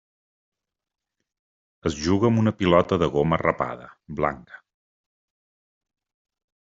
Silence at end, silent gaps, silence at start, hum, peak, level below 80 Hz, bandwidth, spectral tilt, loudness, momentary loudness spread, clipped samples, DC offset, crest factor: 2.05 s; none; 1.85 s; none; -4 dBFS; -52 dBFS; 7.8 kHz; -6 dB/octave; -23 LUFS; 12 LU; under 0.1%; under 0.1%; 22 dB